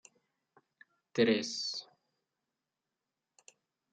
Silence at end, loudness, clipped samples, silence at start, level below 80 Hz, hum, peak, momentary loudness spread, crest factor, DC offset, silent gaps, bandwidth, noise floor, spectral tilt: 2.1 s; -33 LUFS; under 0.1%; 1.15 s; -84 dBFS; none; -16 dBFS; 11 LU; 24 dB; under 0.1%; none; 9.2 kHz; -89 dBFS; -4 dB/octave